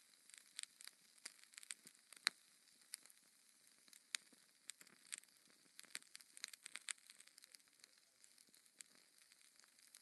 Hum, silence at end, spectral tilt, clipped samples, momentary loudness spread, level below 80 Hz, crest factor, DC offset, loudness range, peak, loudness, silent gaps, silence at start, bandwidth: none; 0 s; 2.5 dB/octave; under 0.1%; 18 LU; under -90 dBFS; 44 dB; under 0.1%; 6 LU; -14 dBFS; -53 LUFS; none; 0 s; 12 kHz